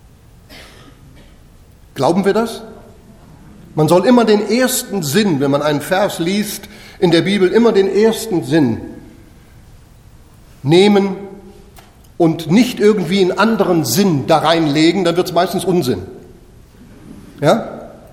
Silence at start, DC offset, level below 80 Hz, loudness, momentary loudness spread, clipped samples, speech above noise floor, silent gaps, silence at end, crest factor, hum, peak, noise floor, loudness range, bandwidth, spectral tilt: 0.5 s; under 0.1%; -46 dBFS; -14 LUFS; 13 LU; under 0.1%; 30 dB; none; 0.15 s; 16 dB; none; 0 dBFS; -43 dBFS; 5 LU; 16.5 kHz; -5.5 dB/octave